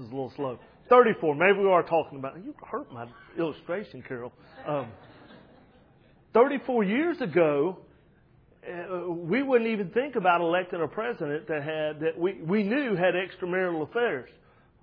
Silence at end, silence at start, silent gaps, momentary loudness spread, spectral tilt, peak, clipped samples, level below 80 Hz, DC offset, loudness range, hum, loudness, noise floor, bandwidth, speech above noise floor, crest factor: 0.55 s; 0 s; none; 16 LU; -9.5 dB/octave; -6 dBFS; under 0.1%; -68 dBFS; under 0.1%; 11 LU; none; -27 LUFS; -60 dBFS; 5.2 kHz; 33 dB; 22 dB